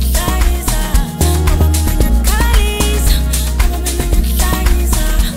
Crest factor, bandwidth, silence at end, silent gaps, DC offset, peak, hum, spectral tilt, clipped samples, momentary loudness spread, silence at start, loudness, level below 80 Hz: 12 dB; 16.5 kHz; 0 s; none; under 0.1%; 0 dBFS; none; -4.5 dB/octave; under 0.1%; 3 LU; 0 s; -14 LUFS; -12 dBFS